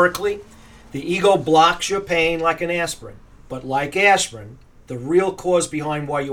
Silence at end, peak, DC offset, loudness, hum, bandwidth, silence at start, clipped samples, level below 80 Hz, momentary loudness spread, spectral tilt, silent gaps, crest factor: 0 s; -2 dBFS; under 0.1%; -19 LUFS; none; 19 kHz; 0 s; under 0.1%; -48 dBFS; 18 LU; -4 dB/octave; none; 18 dB